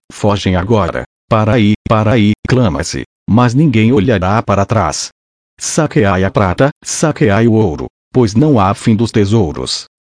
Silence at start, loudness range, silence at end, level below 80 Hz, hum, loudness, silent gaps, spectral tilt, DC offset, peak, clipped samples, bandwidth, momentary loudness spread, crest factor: 0.15 s; 2 LU; 0.25 s; -36 dBFS; none; -12 LUFS; 1.06-1.28 s, 1.76-1.85 s, 2.39-2.43 s, 3.06-3.26 s, 5.12-5.57 s, 6.72-6.81 s, 7.90-8.11 s; -6 dB/octave; under 0.1%; 0 dBFS; under 0.1%; 10.5 kHz; 8 LU; 12 dB